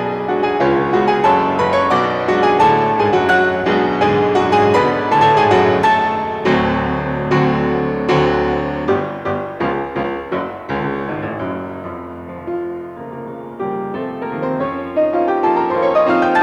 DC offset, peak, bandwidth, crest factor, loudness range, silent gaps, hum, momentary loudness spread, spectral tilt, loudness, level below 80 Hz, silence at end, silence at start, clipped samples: under 0.1%; -2 dBFS; 9.6 kHz; 14 dB; 11 LU; none; none; 12 LU; -7 dB/octave; -16 LUFS; -44 dBFS; 0 s; 0 s; under 0.1%